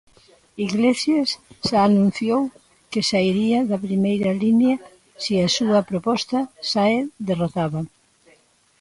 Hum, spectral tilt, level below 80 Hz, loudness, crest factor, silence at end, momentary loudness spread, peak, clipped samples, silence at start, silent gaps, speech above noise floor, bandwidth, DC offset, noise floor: none; -5.5 dB/octave; -56 dBFS; -21 LUFS; 14 dB; 0.95 s; 9 LU; -6 dBFS; under 0.1%; 0.55 s; none; 38 dB; 11.5 kHz; under 0.1%; -58 dBFS